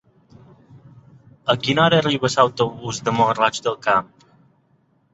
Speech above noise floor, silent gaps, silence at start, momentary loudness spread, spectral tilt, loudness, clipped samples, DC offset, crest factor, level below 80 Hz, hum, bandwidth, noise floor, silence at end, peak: 43 dB; none; 0.75 s; 7 LU; -4.5 dB/octave; -19 LUFS; under 0.1%; under 0.1%; 20 dB; -58 dBFS; none; 8.2 kHz; -61 dBFS; 1.1 s; -2 dBFS